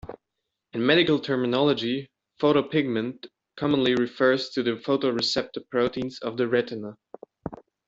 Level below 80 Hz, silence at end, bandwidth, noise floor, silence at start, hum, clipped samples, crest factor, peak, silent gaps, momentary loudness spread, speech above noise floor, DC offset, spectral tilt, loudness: -60 dBFS; 0.35 s; 7.8 kHz; -83 dBFS; 0.05 s; none; under 0.1%; 20 dB; -6 dBFS; none; 18 LU; 59 dB; under 0.1%; -5.5 dB/octave; -25 LUFS